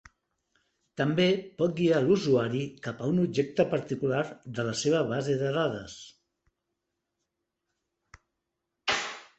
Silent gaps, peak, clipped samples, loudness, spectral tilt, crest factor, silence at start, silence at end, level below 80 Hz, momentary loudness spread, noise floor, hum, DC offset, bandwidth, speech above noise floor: none; -10 dBFS; under 0.1%; -28 LUFS; -5.5 dB/octave; 20 dB; 1 s; 0.15 s; -64 dBFS; 10 LU; -84 dBFS; none; under 0.1%; 8.4 kHz; 57 dB